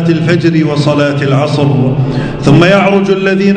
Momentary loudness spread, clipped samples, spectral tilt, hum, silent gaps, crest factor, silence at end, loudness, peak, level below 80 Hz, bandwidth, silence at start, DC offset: 5 LU; 2%; -7.5 dB/octave; none; none; 8 dB; 0 s; -9 LUFS; 0 dBFS; -36 dBFS; 9.2 kHz; 0 s; under 0.1%